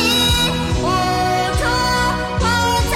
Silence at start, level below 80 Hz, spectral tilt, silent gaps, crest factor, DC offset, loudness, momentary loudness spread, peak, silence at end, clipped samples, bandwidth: 0 s; -26 dBFS; -3.5 dB/octave; none; 12 dB; under 0.1%; -17 LUFS; 5 LU; -6 dBFS; 0 s; under 0.1%; 16.5 kHz